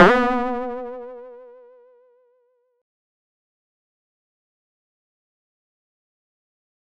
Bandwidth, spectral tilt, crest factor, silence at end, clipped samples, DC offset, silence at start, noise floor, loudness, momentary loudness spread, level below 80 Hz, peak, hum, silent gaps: 10.5 kHz; -6.5 dB/octave; 22 dB; 5.45 s; under 0.1%; under 0.1%; 0 s; -65 dBFS; -21 LUFS; 24 LU; -52 dBFS; -4 dBFS; none; none